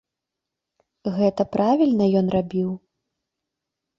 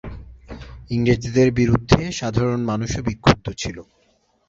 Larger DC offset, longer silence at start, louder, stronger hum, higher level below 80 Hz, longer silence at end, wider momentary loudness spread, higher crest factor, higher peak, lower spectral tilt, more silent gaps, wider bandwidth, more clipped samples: neither; first, 1.05 s vs 0.05 s; about the same, -21 LUFS vs -20 LUFS; neither; second, -56 dBFS vs -36 dBFS; first, 1.2 s vs 0.65 s; second, 11 LU vs 22 LU; about the same, 18 dB vs 20 dB; second, -6 dBFS vs -2 dBFS; first, -9 dB/octave vs -6 dB/octave; neither; second, 7 kHz vs 7.8 kHz; neither